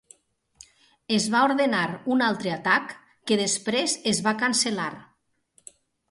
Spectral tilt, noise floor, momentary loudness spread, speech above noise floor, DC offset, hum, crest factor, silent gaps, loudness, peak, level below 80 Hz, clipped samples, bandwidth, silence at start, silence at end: -3 dB/octave; -65 dBFS; 6 LU; 41 dB; under 0.1%; none; 20 dB; none; -24 LUFS; -6 dBFS; -68 dBFS; under 0.1%; 11.5 kHz; 1.1 s; 1.05 s